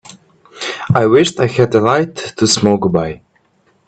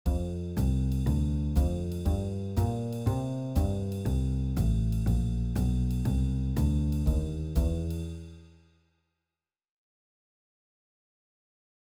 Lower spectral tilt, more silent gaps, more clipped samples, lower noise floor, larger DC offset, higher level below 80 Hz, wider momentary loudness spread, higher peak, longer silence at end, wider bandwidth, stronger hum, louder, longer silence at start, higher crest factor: second, -5 dB/octave vs -8 dB/octave; neither; neither; second, -57 dBFS vs under -90 dBFS; neither; second, -48 dBFS vs -32 dBFS; first, 13 LU vs 4 LU; first, 0 dBFS vs -14 dBFS; second, 0.7 s vs 3.5 s; second, 9.2 kHz vs 15 kHz; neither; first, -14 LUFS vs -30 LUFS; about the same, 0.05 s vs 0.05 s; about the same, 14 dB vs 16 dB